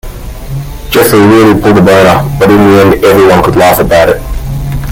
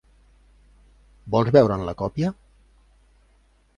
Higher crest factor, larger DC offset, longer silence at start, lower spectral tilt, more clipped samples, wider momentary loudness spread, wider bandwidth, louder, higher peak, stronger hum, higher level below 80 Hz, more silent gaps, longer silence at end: second, 6 dB vs 24 dB; neither; second, 0.05 s vs 1.25 s; second, -6 dB/octave vs -8.5 dB/octave; first, 4% vs under 0.1%; first, 16 LU vs 11 LU; first, over 20 kHz vs 9.8 kHz; first, -5 LUFS vs -21 LUFS; about the same, 0 dBFS vs -2 dBFS; second, none vs 50 Hz at -45 dBFS; first, -22 dBFS vs -48 dBFS; neither; second, 0 s vs 1.45 s